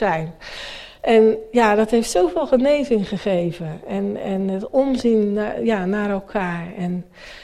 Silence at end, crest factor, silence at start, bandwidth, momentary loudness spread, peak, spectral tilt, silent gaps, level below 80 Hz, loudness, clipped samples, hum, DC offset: 0 s; 16 dB; 0 s; 13.5 kHz; 14 LU; -4 dBFS; -6 dB/octave; none; -46 dBFS; -20 LUFS; under 0.1%; none; under 0.1%